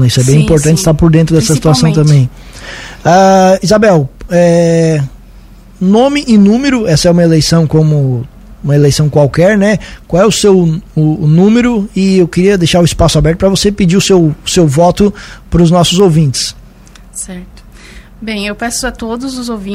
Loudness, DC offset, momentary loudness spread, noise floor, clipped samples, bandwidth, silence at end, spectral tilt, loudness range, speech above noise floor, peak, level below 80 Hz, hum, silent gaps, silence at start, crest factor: -9 LUFS; under 0.1%; 12 LU; -35 dBFS; 0.5%; 15.5 kHz; 0 s; -6 dB/octave; 4 LU; 27 dB; 0 dBFS; -28 dBFS; none; none; 0 s; 8 dB